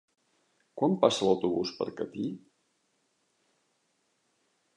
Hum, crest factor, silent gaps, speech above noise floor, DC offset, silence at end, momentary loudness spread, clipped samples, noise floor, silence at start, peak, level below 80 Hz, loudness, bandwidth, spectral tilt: none; 24 dB; none; 47 dB; under 0.1%; 2.4 s; 13 LU; under 0.1%; -75 dBFS; 0.75 s; -8 dBFS; -72 dBFS; -29 LUFS; 11 kHz; -5.5 dB/octave